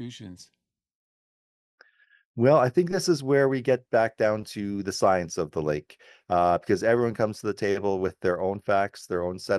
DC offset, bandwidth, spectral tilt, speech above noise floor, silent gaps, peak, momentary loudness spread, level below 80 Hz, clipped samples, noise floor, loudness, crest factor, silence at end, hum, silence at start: under 0.1%; 12.5 kHz; -6 dB/octave; over 65 dB; 0.95-1.78 s, 2.25-2.34 s; -8 dBFS; 9 LU; -60 dBFS; under 0.1%; under -90 dBFS; -25 LUFS; 18 dB; 0 s; none; 0 s